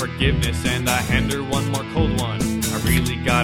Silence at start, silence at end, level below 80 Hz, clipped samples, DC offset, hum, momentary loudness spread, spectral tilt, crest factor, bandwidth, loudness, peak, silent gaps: 0 s; 0 s; -30 dBFS; under 0.1%; under 0.1%; none; 3 LU; -4.5 dB/octave; 18 dB; 16.5 kHz; -21 LUFS; -2 dBFS; none